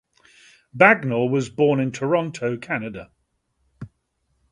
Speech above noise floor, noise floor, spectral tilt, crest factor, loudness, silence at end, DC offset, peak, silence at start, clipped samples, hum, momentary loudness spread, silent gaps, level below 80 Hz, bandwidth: 51 dB; -71 dBFS; -6.5 dB/octave; 22 dB; -20 LUFS; 0.65 s; under 0.1%; 0 dBFS; 0.75 s; under 0.1%; none; 27 LU; none; -60 dBFS; 11 kHz